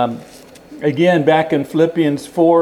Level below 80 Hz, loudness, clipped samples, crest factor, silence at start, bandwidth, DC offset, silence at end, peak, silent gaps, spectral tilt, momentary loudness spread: -58 dBFS; -15 LUFS; under 0.1%; 16 dB; 0 s; 14.5 kHz; under 0.1%; 0 s; 0 dBFS; none; -7 dB/octave; 8 LU